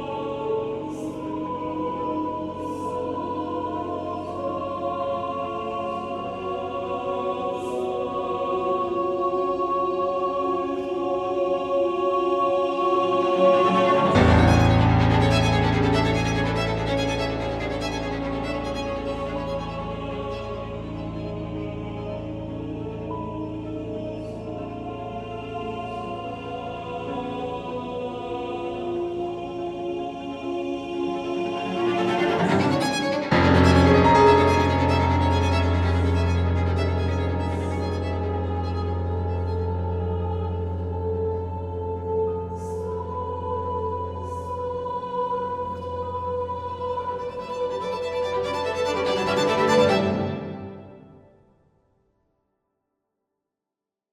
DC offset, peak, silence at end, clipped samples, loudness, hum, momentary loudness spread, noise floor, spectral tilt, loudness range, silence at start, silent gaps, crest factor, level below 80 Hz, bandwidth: under 0.1%; -4 dBFS; 2.95 s; under 0.1%; -25 LUFS; none; 13 LU; -88 dBFS; -6.5 dB/octave; 13 LU; 0 s; none; 20 dB; -42 dBFS; 11.5 kHz